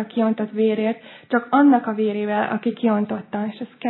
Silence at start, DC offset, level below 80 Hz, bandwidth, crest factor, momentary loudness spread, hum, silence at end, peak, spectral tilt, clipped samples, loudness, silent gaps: 0 s; under 0.1%; -82 dBFS; 4.2 kHz; 16 dB; 11 LU; none; 0 s; -4 dBFS; -11 dB/octave; under 0.1%; -21 LUFS; none